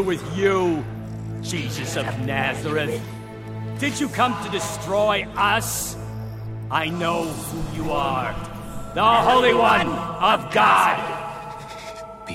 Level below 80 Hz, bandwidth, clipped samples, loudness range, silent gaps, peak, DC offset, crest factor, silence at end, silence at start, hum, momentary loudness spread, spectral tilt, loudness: -44 dBFS; 16.5 kHz; under 0.1%; 7 LU; none; -4 dBFS; under 0.1%; 18 dB; 0 s; 0 s; none; 17 LU; -4.5 dB/octave; -21 LUFS